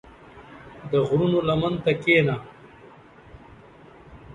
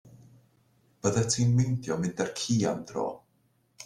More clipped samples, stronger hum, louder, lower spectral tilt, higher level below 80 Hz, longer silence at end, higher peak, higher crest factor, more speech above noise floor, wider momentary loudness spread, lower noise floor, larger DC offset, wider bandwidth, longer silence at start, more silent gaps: neither; neither; first, -22 LUFS vs -28 LUFS; first, -7.5 dB/octave vs -5.5 dB/octave; first, -52 dBFS vs -62 dBFS; about the same, 0 s vs 0 s; first, -6 dBFS vs -12 dBFS; about the same, 18 dB vs 18 dB; second, 27 dB vs 42 dB; first, 25 LU vs 9 LU; second, -48 dBFS vs -69 dBFS; neither; second, 10 kHz vs 12 kHz; first, 0.35 s vs 0.05 s; neither